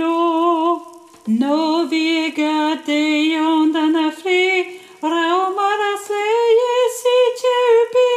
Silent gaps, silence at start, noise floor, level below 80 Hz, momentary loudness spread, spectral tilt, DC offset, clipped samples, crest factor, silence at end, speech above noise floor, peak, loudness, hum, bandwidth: none; 0 s; -38 dBFS; -76 dBFS; 6 LU; -3.5 dB/octave; under 0.1%; under 0.1%; 12 dB; 0 s; 21 dB; -6 dBFS; -17 LUFS; none; 15 kHz